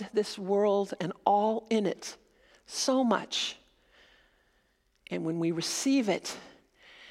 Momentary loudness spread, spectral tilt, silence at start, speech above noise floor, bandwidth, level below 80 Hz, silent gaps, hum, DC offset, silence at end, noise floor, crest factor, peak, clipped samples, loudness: 13 LU; -4 dB/octave; 0 s; 42 dB; 15.5 kHz; -74 dBFS; none; none; under 0.1%; 0 s; -71 dBFS; 22 dB; -10 dBFS; under 0.1%; -30 LUFS